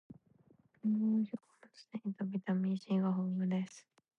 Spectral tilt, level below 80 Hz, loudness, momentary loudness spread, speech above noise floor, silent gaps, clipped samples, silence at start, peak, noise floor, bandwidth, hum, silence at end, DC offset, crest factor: -8.5 dB/octave; -86 dBFS; -36 LUFS; 11 LU; 33 dB; none; under 0.1%; 0.1 s; -24 dBFS; -68 dBFS; 7.6 kHz; none; 0.4 s; under 0.1%; 12 dB